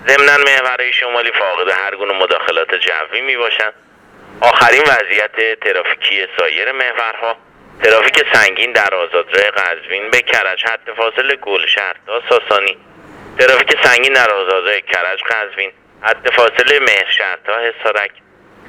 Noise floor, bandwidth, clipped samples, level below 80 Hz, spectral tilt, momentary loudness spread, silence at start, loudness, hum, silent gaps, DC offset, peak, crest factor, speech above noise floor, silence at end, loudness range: -36 dBFS; 19 kHz; 0.2%; -56 dBFS; -1 dB/octave; 9 LU; 0 s; -12 LUFS; none; none; under 0.1%; 0 dBFS; 14 dB; 23 dB; 0.6 s; 2 LU